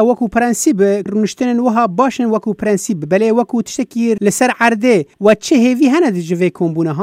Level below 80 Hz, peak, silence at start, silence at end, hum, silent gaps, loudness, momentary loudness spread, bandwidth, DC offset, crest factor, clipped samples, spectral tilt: -52 dBFS; 0 dBFS; 0 s; 0 s; none; none; -14 LUFS; 6 LU; 16 kHz; under 0.1%; 14 dB; under 0.1%; -5.5 dB/octave